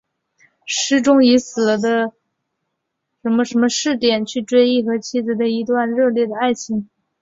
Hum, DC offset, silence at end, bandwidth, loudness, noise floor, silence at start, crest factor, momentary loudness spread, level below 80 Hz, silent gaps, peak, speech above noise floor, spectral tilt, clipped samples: none; under 0.1%; 0.35 s; 7.8 kHz; -17 LUFS; -76 dBFS; 0.65 s; 16 dB; 9 LU; -62 dBFS; none; -2 dBFS; 59 dB; -3.5 dB/octave; under 0.1%